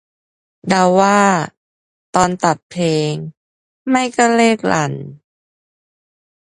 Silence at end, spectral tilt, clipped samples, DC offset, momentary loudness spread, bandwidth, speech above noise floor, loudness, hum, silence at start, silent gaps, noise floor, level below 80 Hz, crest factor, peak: 1.35 s; -5 dB/octave; under 0.1%; under 0.1%; 17 LU; 11.5 kHz; over 75 dB; -15 LUFS; none; 0.65 s; 1.57-2.13 s, 2.63-2.70 s, 3.37-3.85 s; under -90 dBFS; -54 dBFS; 18 dB; 0 dBFS